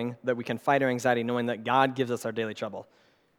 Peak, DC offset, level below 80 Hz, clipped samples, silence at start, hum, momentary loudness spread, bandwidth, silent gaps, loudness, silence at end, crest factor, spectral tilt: -8 dBFS; under 0.1%; -80 dBFS; under 0.1%; 0 s; none; 10 LU; 17.5 kHz; none; -28 LUFS; 0.55 s; 20 dB; -5.5 dB/octave